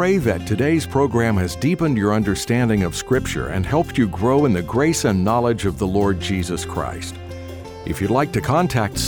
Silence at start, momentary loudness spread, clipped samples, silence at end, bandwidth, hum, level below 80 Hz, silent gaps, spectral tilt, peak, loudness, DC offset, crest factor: 0 s; 9 LU; under 0.1%; 0 s; over 20 kHz; none; -38 dBFS; none; -6 dB/octave; -6 dBFS; -19 LUFS; under 0.1%; 14 dB